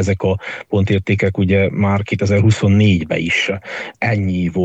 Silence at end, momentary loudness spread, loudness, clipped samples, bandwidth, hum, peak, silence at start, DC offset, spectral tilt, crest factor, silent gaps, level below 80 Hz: 0 s; 8 LU; -16 LUFS; under 0.1%; 8.2 kHz; none; -2 dBFS; 0 s; under 0.1%; -6.5 dB/octave; 14 dB; none; -44 dBFS